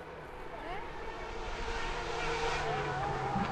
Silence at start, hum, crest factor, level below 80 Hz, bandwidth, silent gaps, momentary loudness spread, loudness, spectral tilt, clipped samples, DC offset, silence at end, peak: 0 s; none; 16 dB; -44 dBFS; 12 kHz; none; 10 LU; -37 LUFS; -4.5 dB/octave; under 0.1%; under 0.1%; 0 s; -22 dBFS